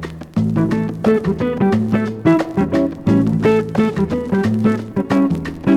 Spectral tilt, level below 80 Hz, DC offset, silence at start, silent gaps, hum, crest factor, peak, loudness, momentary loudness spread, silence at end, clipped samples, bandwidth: -8.5 dB/octave; -44 dBFS; under 0.1%; 0 s; none; none; 14 dB; -2 dBFS; -17 LUFS; 4 LU; 0 s; under 0.1%; 11.5 kHz